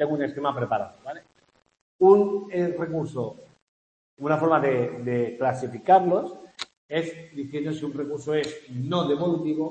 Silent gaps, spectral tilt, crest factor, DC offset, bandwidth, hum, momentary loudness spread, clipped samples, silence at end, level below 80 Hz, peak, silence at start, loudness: 1.81-1.99 s, 3.62-4.17 s, 6.77-6.89 s; -7 dB/octave; 22 dB; under 0.1%; 8.6 kHz; none; 16 LU; under 0.1%; 0 s; -68 dBFS; -4 dBFS; 0 s; -25 LUFS